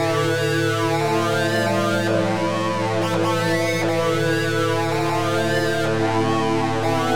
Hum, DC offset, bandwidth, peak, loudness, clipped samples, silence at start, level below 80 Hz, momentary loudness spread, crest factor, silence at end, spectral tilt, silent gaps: none; 1%; 17.5 kHz; -8 dBFS; -20 LUFS; under 0.1%; 0 s; -58 dBFS; 1 LU; 12 dB; 0 s; -5.5 dB/octave; none